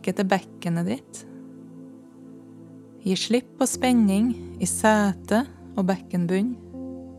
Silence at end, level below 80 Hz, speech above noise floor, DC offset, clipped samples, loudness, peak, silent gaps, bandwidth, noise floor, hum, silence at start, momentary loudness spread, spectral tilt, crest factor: 0 s; -58 dBFS; 22 dB; under 0.1%; under 0.1%; -24 LUFS; -4 dBFS; none; 14.5 kHz; -45 dBFS; none; 0 s; 23 LU; -5 dB/octave; 20 dB